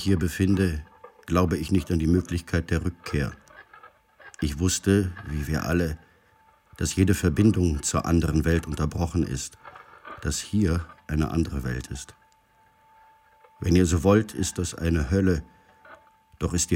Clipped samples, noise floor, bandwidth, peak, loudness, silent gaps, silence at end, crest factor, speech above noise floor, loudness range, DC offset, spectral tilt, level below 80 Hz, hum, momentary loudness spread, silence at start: under 0.1%; -61 dBFS; 16.5 kHz; -8 dBFS; -25 LUFS; none; 0 s; 18 dB; 37 dB; 5 LU; under 0.1%; -5.5 dB/octave; -38 dBFS; none; 12 LU; 0 s